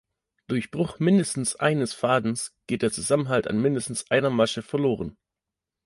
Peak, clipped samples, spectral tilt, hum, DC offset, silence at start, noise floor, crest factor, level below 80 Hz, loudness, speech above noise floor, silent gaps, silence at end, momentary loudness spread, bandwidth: -8 dBFS; under 0.1%; -5 dB/octave; none; under 0.1%; 0.5 s; -87 dBFS; 18 dB; -58 dBFS; -25 LUFS; 63 dB; none; 0.75 s; 8 LU; 11.5 kHz